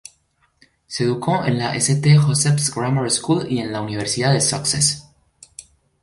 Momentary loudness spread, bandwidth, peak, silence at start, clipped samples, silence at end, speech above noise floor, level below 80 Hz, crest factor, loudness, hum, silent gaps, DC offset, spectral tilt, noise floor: 11 LU; 11.5 kHz; -2 dBFS; 0.9 s; under 0.1%; 0.4 s; 45 dB; -52 dBFS; 18 dB; -18 LUFS; none; none; under 0.1%; -4.5 dB/octave; -63 dBFS